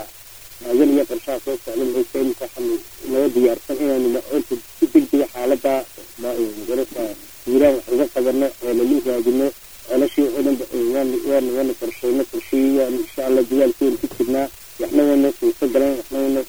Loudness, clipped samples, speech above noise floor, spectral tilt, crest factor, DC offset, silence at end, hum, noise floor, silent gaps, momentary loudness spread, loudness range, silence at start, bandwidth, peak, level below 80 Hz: -20 LUFS; under 0.1%; 22 dB; -4.5 dB/octave; 16 dB; 0.8%; 0 s; none; -41 dBFS; none; 9 LU; 2 LU; 0 s; over 20 kHz; -2 dBFS; -52 dBFS